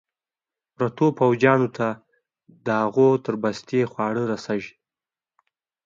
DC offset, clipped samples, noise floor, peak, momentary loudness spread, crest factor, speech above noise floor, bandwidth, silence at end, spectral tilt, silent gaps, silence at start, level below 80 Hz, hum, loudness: under 0.1%; under 0.1%; under -90 dBFS; -4 dBFS; 11 LU; 20 dB; over 69 dB; 7.6 kHz; 1.15 s; -7.5 dB/octave; none; 0.8 s; -66 dBFS; none; -22 LUFS